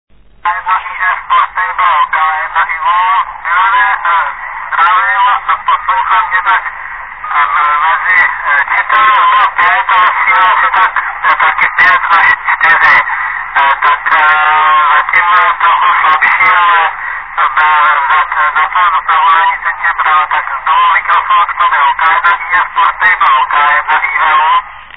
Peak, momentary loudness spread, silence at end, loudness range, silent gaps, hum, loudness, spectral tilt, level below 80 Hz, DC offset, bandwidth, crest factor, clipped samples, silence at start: 0 dBFS; 6 LU; 0 s; 3 LU; none; none; -9 LUFS; -2.5 dB/octave; -46 dBFS; 0.8%; 5.4 kHz; 10 dB; 0.2%; 0.45 s